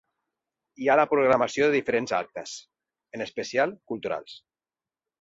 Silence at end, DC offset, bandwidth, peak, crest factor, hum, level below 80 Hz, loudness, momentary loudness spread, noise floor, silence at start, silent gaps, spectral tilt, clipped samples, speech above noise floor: 0.85 s; under 0.1%; 8 kHz; -8 dBFS; 20 dB; none; -68 dBFS; -25 LUFS; 17 LU; under -90 dBFS; 0.8 s; none; -4.5 dB/octave; under 0.1%; over 65 dB